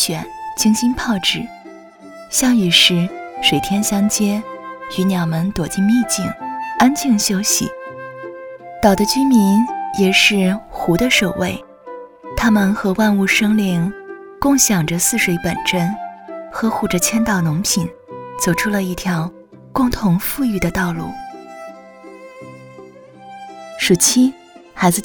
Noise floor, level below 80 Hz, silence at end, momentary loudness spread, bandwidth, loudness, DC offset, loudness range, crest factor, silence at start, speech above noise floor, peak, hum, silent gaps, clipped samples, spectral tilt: -39 dBFS; -42 dBFS; 0 s; 20 LU; over 20 kHz; -16 LUFS; under 0.1%; 5 LU; 18 dB; 0 s; 24 dB; 0 dBFS; none; none; under 0.1%; -3.5 dB/octave